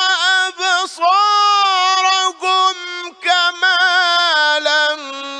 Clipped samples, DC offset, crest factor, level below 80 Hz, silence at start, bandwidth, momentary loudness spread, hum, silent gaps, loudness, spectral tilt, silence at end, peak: under 0.1%; under 0.1%; 12 dB; -80 dBFS; 0 s; 10.5 kHz; 5 LU; none; none; -13 LUFS; 3.5 dB/octave; 0 s; -2 dBFS